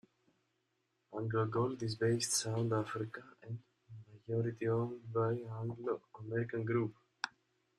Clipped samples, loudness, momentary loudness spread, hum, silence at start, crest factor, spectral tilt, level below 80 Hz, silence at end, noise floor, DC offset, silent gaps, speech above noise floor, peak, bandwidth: under 0.1%; -37 LUFS; 15 LU; none; 1.1 s; 22 dB; -5 dB/octave; -74 dBFS; 0.5 s; -82 dBFS; under 0.1%; none; 45 dB; -16 dBFS; 13.5 kHz